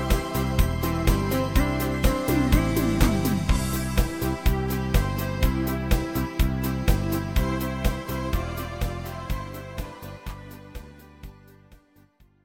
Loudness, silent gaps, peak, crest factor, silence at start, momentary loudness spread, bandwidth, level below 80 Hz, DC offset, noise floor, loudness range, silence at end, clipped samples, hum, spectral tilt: -26 LUFS; none; -4 dBFS; 20 dB; 0 s; 16 LU; 17 kHz; -28 dBFS; under 0.1%; -57 dBFS; 12 LU; 0.7 s; under 0.1%; none; -6 dB/octave